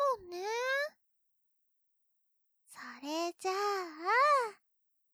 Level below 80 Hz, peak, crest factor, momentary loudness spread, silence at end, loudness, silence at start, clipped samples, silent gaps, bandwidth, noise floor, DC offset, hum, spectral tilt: -84 dBFS; -18 dBFS; 18 dB; 14 LU; 0.6 s; -33 LUFS; 0 s; under 0.1%; none; over 20 kHz; -78 dBFS; under 0.1%; none; -1 dB/octave